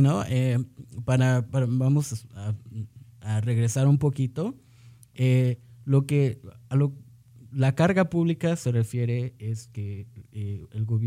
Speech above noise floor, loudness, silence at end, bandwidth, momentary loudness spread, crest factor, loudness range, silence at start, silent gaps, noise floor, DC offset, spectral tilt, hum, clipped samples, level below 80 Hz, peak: 28 dB; -26 LUFS; 0 s; 13.5 kHz; 14 LU; 18 dB; 2 LU; 0 s; none; -52 dBFS; under 0.1%; -7.5 dB/octave; none; under 0.1%; -58 dBFS; -8 dBFS